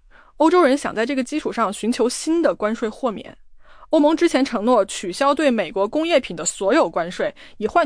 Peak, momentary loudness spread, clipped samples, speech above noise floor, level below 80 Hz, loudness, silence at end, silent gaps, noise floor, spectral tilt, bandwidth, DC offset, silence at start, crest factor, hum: -6 dBFS; 8 LU; under 0.1%; 20 dB; -52 dBFS; -20 LUFS; 0 s; none; -40 dBFS; -3.5 dB/octave; 10.5 kHz; under 0.1%; 0.4 s; 14 dB; none